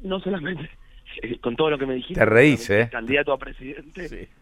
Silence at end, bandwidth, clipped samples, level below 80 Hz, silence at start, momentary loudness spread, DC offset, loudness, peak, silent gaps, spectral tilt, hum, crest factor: 0.15 s; 13.5 kHz; under 0.1%; -44 dBFS; 0 s; 21 LU; under 0.1%; -21 LUFS; -2 dBFS; none; -6 dB/octave; none; 22 dB